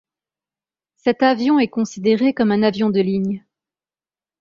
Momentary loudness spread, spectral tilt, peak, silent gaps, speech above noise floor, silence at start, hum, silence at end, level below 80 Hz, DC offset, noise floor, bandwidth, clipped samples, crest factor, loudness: 6 LU; -6.5 dB/octave; -2 dBFS; none; over 73 dB; 1.05 s; none; 1.05 s; -60 dBFS; under 0.1%; under -90 dBFS; 7.4 kHz; under 0.1%; 18 dB; -18 LUFS